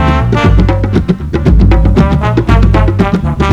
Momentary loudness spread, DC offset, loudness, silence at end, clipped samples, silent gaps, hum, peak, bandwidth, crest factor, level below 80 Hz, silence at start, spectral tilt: 4 LU; under 0.1%; -10 LUFS; 0 s; 2%; none; none; 0 dBFS; 7.4 kHz; 8 dB; -12 dBFS; 0 s; -8 dB/octave